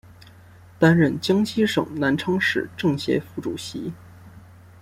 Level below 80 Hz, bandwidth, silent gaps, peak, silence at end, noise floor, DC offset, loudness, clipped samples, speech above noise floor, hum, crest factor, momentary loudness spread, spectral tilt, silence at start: -58 dBFS; 15.5 kHz; none; -4 dBFS; 0.4 s; -48 dBFS; under 0.1%; -22 LUFS; under 0.1%; 26 dB; none; 20 dB; 13 LU; -6 dB/octave; 0.1 s